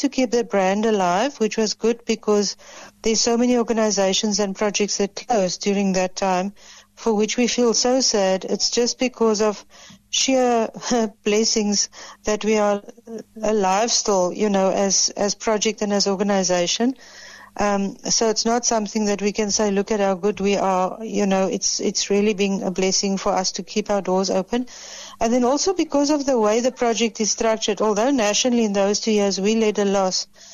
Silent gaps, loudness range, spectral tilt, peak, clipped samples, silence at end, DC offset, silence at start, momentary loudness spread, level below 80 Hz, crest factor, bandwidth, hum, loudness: none; 2 LU; -3.5 dB/octave; -8 dBFS; under 0.1%; 0 s; under 0.1%; 0 s; 6 LU; -52 dBFS; 14 dB; 13 kHz; none; -20 LUFS